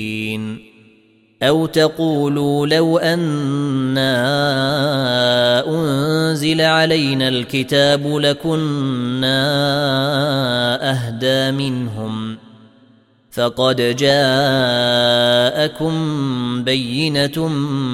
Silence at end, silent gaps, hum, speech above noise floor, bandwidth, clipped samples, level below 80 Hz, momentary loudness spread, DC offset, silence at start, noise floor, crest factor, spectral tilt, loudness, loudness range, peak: 0 s; none; none; 36 dB; 16 kHz; under 0.1%; -54 dBFS; 7 LU; under 0.1%; 0 s; -53 dBFS; 16 dB; -5.5 dB/octave; -16 LUFS; 3 LU; -2 dBFS